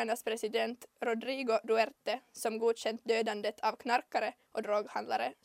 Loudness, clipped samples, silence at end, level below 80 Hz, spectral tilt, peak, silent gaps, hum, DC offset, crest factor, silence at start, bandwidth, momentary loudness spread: -34 LUFS; under 0.1%; 0.1 s; -86 dBFS; -3 dB/octave; -16 dBFS; none; none; under 0.1%; 18 dB; 0 s; 16 kHz; 7 LU